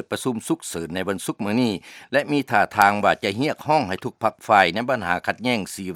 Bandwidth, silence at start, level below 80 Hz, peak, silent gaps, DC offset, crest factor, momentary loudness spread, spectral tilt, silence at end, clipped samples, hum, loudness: 17 kHz; 0.1 s; -60 dBFS; 0 dBFS; none; under 0.1%; 22 dB; 10 LU; -4.5 dB/octave; 0 s; under 0.1%; none; -22 LUFS